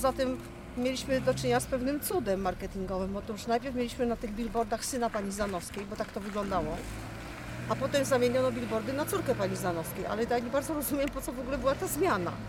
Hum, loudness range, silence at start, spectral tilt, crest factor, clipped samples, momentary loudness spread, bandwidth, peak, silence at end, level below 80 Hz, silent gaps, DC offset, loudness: none; 3 LU; 0 s; -5 dB/octave; 16 dB; under 0.1%; 8 LU; 17 kHz; -14 dBFS; 0 s; -48 dBFS; none; under 0.1%; -32 LUFS